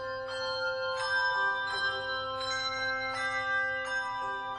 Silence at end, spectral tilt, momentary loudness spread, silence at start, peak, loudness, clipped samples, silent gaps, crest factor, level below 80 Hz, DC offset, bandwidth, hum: 0 s; -1.5 dB/octave; 6 LU; 0 s; -20 dBFS; -31 LUFS; under 0.1%; none; 14 dB; -64 dBFS; under 0.1%; 10.5 kHz; none